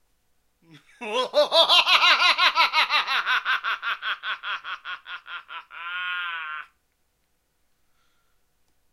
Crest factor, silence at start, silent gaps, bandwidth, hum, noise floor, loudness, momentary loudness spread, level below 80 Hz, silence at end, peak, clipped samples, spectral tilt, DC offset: 22 dB; 0.75 s; none; 15 kHz; none; -71 dBFS; -20 LUFS; 21 LU; -72 dBFS; 2.3 s; -2 dBFS; under 0.1%; 0.5 dB/octave; under 0.1%